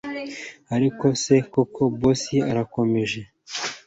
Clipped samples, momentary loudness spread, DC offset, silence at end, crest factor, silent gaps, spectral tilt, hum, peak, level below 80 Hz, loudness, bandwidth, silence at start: under 0.1%; 13 LU; under 0.1%; 0.1 s; 18 dB; none; -5.5 dB/octave; none; -6 dBFS; -52 dBFS; -23 LUFS; 8 kHz; 0.05 s